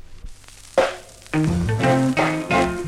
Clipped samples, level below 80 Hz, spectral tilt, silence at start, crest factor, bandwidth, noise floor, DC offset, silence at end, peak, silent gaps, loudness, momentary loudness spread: under 0.1%; -40 dBFS; -6 dB/octave; 0.05 s; 18 dB; 15 kHz; -40 dBFS; under 0.1%; 0 s; -4 dBFS; none; -21 LUFS; 7 LU